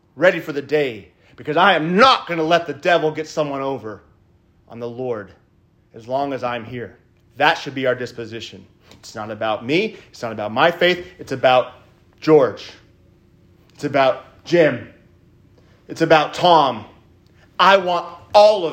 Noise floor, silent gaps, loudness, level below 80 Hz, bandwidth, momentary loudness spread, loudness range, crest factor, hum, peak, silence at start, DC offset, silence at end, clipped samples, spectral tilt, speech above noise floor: -57 dBFS; none; -18 LUFS; -60 dBFS; 16 kHz; 19 LU; 7 LU; 20 dB; none; 0 dBFS; 0.15 s; under 0.1%; 0 s; under 0.1%; -5 dB/octave; 39 dB